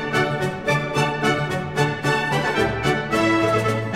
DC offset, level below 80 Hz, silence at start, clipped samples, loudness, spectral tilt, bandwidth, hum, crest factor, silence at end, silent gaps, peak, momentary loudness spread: 0.3%; -46 dBFS; 0 s; under 0.1%; -21 LUFS; -5.5 dB/octave; 16 kHz; none; 16 dB; 0 s; none; -6 dBFS; 4 LU